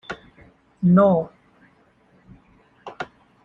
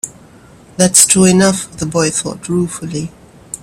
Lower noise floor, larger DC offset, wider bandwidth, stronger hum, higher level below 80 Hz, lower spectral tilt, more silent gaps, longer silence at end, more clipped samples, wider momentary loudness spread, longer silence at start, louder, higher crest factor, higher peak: first, -58 dBFS vs -41 dBFS; neither; second, 4.5 kHz vs over 20 kHz; neither; second, -56 dBFS vs -46 dBFS; first, -10 dB/octave vs -3.5 dB/octave; neither; first, 0.4 s vs 0.05 s; second, under 0.1% vs 0.1%; first, 24 LU vs 20 LU; about the same, 0.1 s vs 0.05 s; second, -18 LUFS vs -12 LUFS; first, 20 dB vs 14 dB; second, -4 dBFS vs 0 dBFS